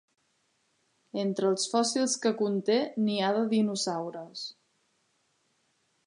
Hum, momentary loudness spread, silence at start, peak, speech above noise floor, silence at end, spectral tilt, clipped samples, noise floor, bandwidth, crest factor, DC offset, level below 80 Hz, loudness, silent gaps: none; 12 LU; 1.15 s; -14 dBFS; 45 dB; 1.55 s; -4 dB/octave; under 0.1%; -73 dBFS; 11 kHz; 18 dB; under 0.1%; -84 dBFS; -28 LUFS; none